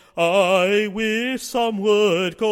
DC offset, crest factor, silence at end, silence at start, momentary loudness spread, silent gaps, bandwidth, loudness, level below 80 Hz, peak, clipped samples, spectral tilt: under 0.1%; 14 dB; 0 s; 0.15 s; 6 LU; none; 16.5 kHz; -19 LUFS; -58 dBFS; -6 dBFS; under 0.1%; -4 dB/octave